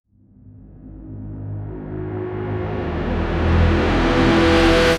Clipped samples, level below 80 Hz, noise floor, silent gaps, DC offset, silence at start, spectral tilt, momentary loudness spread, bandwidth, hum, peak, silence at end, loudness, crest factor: under 0.1%; -28 dBFS; -47 dBFS; none; under 0.1%; 0.45 s; -6.5 dB/octave; 18 LU; 12.5 kHz; none; -4 dBFS; 0 s; -19 LUFS; 16 dB